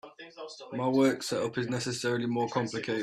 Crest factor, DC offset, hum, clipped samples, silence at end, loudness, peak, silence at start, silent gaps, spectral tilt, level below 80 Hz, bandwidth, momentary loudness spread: 16 dB; under 0.1%; none; under 0.1%; 0 s; -30 LUFS; -14 dBFS; 0.05 s; none; -5 dB/octave; -70 dBFS; 14 kHz; 18 LU